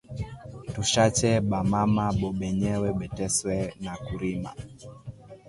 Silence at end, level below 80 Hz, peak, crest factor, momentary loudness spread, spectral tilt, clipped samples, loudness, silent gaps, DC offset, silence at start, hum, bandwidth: 0 s; -46 dBFS; -10 dBFS; 18 dB; 21 LU; -5 dB/octave; under 0.1%; -26 LUFS; none; under 0.1%; 0.1 s; none; 11.5 kHz